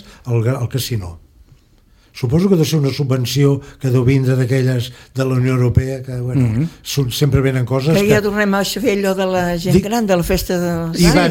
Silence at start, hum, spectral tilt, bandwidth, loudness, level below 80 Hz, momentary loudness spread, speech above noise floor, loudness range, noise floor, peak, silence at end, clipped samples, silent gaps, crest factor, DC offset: 0.05 s; none; -6 dB/octave; 17 kHz; -16 LUFS; -34 dBFS; 7 LU; 35 dB; 3 LU; -51 dBFS; 0 dBFS; 0 s; under 0.1%; none; 16 dB; under 0.1%